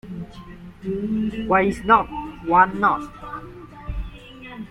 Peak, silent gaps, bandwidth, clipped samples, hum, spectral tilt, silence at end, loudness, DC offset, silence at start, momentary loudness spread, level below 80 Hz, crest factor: -2 dBFS; none; 12.5 kHz; under 0.1%; none; -7 dB/octave; 0.05 s; -20 LUFS; under 0.1%; 0.05 s; 22 LU; -40 dBFS; 20 dB